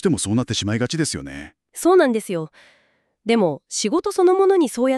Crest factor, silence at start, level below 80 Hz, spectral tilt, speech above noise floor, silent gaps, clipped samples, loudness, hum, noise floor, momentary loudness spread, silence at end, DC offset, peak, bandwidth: 16 dB; 0.05 s; -54 dBFS; -5 dB/octave; 42 dB; none; under 0.1%; -19 LUFS; none; -61 dBFS; 16 LU; 0 s; under 0.1%; -4 dBFS; 13 kHz